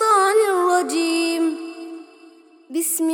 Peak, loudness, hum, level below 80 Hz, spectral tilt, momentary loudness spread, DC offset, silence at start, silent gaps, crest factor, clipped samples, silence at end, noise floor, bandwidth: -6 dBFS; -19 LUFS; none; -80 dBFS; 0 dB/octave; 19 LU; under 0.1%; 0 s; none; 14 dB; under 0.1%; 0 s; -48 dBFS; 19 kHz